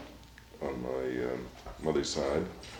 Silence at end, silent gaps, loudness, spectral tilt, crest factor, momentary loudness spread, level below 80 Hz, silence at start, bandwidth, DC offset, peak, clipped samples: 0 s; none; -34 LUFS; -4.5 dB/octave; 18 dB; 18 LU; -52 dBFS; 0 s; 19.5 kHz; under 0.1%; -16 dBFS; under 0.1%